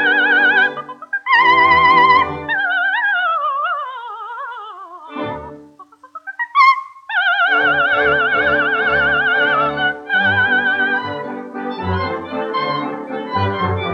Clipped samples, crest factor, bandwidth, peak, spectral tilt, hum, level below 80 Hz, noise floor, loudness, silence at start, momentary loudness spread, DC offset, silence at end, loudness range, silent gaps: under 0.1%; 14 dB; 7.4 kHz; -2 dBFS; -5.5 dB/octave; none; -52 dBFS; -43 dBFS; -15 LUFS; 0 s; 17 LU; under 0.1%; 0 s; 7 LU; none